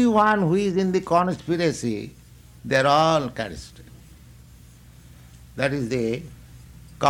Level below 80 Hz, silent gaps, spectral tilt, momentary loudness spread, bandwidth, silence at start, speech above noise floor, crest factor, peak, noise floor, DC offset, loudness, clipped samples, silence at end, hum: -50 dBFS; none; -5.5 dB/octave; 22 LU; 16.5 kHz; 0 s; 26 dB; 18 dB; -6 dBFS; -48 dBFS; under 0.1%; -22 LUFS; under 0.1%; 0 s; none